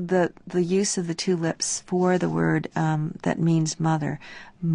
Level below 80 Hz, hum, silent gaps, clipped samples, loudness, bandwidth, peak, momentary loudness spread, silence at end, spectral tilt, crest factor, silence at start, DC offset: -60 dBFS; none; none; under 0.1%; -24 LUFS; 10.5 kHz; -10 dBFS; 5 LU; 0 s; -5.5 dB/octave; 14 dB; 0 s; under 0.1%